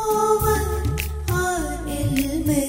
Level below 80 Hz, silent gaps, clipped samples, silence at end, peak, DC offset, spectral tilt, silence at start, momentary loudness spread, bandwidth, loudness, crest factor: -30 dBFS; none; under 0.1%; 0 s; -6 dBFS; under 0.1%; -5.5 dB/octave; 0 s; 7 LU; 16.5 kHz; -22 LUFS; 16 dB